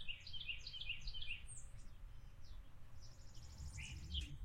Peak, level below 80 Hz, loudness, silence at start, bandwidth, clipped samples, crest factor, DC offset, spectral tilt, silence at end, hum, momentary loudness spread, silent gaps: -32 dBFS; -54 dBFS; -50 LUFS; 0 s; 13 kHz; under 0.1%; 16 dB; under 0.1%; -2 dB/octave; 0 s; none; 14 LU; none